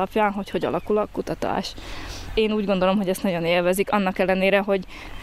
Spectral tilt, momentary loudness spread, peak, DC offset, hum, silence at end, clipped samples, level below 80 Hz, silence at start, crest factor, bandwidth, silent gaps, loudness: -5.5 dB/octave; 9 LU; -6 dBFS; under 0.1%; none; 0 s; under 0.1%; -42 dBFS; 0 s; 16 dB; 15.5 kHz; none; -23 LUFS